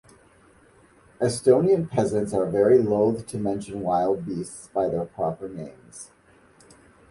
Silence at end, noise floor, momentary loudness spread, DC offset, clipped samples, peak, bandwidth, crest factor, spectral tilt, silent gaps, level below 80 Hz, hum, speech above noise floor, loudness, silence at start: 1.05 s; -56 dBFS; 20 LU; under 0.1%; under 0.1%; -6 dBFS; 11.5 kHz; 18 dB; -7 dB/octave; none; -56 dBFS; none; 33 dB; -24 LUFS; 1.2 s